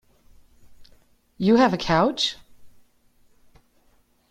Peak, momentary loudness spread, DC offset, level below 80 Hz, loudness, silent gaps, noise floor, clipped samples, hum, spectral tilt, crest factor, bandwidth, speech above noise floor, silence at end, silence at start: -6 dBFS; 8 LU; under 0.1%; -52 dBFS; -21 LUFS; none; -62 dBFS; under 0.1%; none; -5 dB/octave; 20 dB; 12 kHz; 42 dB; 1.65 s; 0.8 s